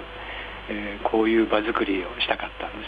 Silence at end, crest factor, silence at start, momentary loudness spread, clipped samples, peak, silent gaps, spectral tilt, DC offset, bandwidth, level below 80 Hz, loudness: 0 s; 18 dB; 0 s; 13 LU; under 0.1%; -6 dBFS; none; -6.5 dB/octave; under 0.1%; 4.9 kHz; -46 dBFS; -25 LUFS